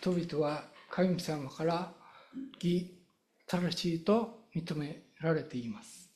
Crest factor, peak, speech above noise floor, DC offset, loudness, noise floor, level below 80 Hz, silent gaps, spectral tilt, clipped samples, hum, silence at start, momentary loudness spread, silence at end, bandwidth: 18 dB; -16 dBFS; 36 dB; under 0.1%; -35 LUFS; -69 dBFS; -68 dBFS; none; -6.5 dB/octave; under 0.1%; none; 0 s; 15 LU; 0.1 s; 13.5 kHz